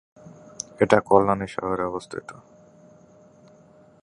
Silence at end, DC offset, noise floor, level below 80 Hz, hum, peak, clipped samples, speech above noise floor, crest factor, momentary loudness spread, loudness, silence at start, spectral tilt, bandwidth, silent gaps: 1.7 s; under 0.1%; -53 dBFS; -56 dBFS; none; 0 dBFS; under 0.1%; 31 dB; 26 dB; 20 LU; -22 LUFS; 0.8 s; -5.5 dB/octave; 11 kHz; none